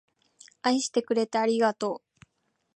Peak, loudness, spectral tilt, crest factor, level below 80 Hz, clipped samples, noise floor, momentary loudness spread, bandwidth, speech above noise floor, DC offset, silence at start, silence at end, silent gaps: -10 dBFS; -27 LUFS; -3.5 dB/octave; 18 dB; -78 dBFS; under 0.1%; -76 dBFS; 8 LU; 10.5 kHz; 50 dB; under 0.1%; 0.65 s; 0.8 s; none